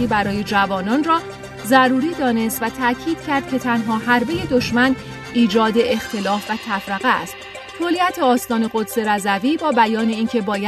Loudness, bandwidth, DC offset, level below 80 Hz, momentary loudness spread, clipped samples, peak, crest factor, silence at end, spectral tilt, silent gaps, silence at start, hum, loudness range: -18 LUFS; 14 kHz; under 0.1%; -48 dBFS; 7 LU; under 0.1%; 0 dBFS; 18 dB; 0 s; -4.5 dB/octave; none; 0 s; none; 2 LU